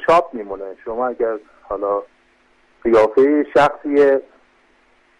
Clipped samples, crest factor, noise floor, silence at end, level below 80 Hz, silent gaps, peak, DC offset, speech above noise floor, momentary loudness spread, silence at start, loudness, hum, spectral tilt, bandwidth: under 0.1%; 14 dB; -56 dBFS; 1 s; -52 dBFS; none; -4 dBFS; under 0.1%; 40 dB; 15 LU; 0 s; -17 LUFS; none; -6 dB/octave; 10.5 kHz